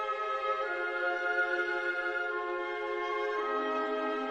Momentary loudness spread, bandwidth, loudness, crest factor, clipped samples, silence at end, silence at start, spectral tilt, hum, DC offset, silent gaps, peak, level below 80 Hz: 4 LU; 9.2 kHz; -32 LUFS; 14 dB; under 0.1%; 0 s; 0 s; -3 dB/octave; none; under 0.1%; none; -20 dBFS; -74 dBFS